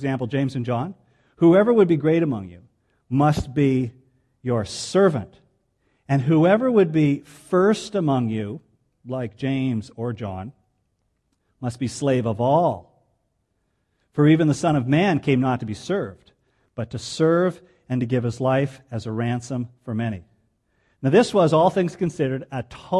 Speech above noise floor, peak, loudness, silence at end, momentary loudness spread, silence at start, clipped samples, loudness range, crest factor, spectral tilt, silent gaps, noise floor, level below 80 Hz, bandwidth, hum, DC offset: 51 dB; -4 dBFS; -21 LUFS; 0 s; 15 LU; 0 s; under 0.1%; 6 LU; 18 dB; -7 dB/octave; none; -71 dBFS; -54 dBFS; 12 kHz; none; under 0.1%